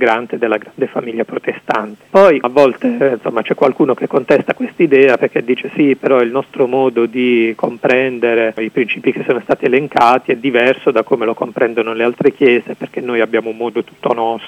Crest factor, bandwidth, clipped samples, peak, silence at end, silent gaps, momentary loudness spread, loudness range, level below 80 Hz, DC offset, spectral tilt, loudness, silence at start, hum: 14 dB; 9.6 kHz; 0.4%; 0 dBFS; 0 s; none; 8 LU; 2 LU; -60 dBFS; under 0.1%; -6.5 dB/octave; -14 LUFS; 0 s; none